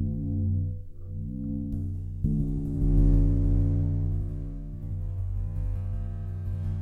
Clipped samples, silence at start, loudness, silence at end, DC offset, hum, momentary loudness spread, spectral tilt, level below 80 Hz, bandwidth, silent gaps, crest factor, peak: under 0.1%; 0 s; -30 LUFS; 0 s; under 0.1%; none; 12 LU; -11.5 dB/octave; -30 dBFS; 1.8 kHz; none; 16 dB; -10 dBFS